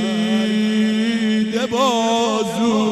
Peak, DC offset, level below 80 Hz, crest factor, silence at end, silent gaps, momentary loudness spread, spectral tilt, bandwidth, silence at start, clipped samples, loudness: -6 dBFS; under 0.1%; -60 dBFS; 12 dB; 0 s; none; 2 LU; -4.5 dB/octave; 13 kHz; 0 s; under 0.1%; -18 LUFS